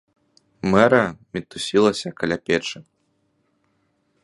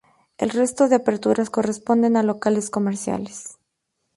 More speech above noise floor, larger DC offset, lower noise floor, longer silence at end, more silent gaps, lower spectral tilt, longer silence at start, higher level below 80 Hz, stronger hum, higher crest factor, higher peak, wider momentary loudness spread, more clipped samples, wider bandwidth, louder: second, 48 dB vs 56 dB; neither; second, -68 dBFS vs -76 dBFS; first, 1.4 s vs 0.65 s; neither; about the same, -5 dB/octave vs -5.5 dB/octave; first, 0.65 s vs 0.4 s; first, -54 dBFS vs -62 dBFS; neither; about the same, 22 dB vs 18 dB; first, 0 dBFS vs -4 dBFS; first, 16 LU vs 11 LU; neither; about the same, 11.5 kHz vs 11.5 kHz; about the same, -21 LUFS vs -21 LUFS